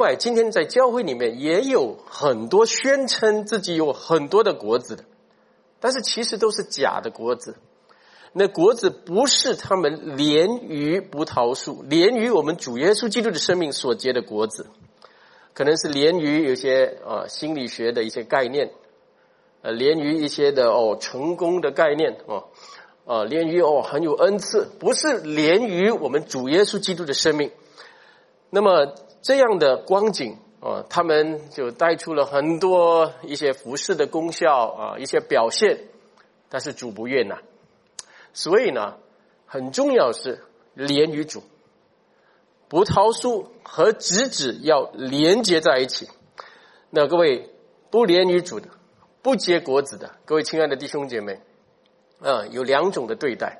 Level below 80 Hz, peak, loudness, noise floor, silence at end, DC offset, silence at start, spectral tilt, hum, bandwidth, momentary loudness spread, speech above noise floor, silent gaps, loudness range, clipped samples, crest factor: -66 dBFS; -2 dBFS; -21 LUFS; -61 dBFS; 0 s; under 0.1%; 0 s; -3.5 dB/octave; none; 11.5 kHz; 12 LU; 40 dB; none; 4 LU; under 0.1%; 20 dB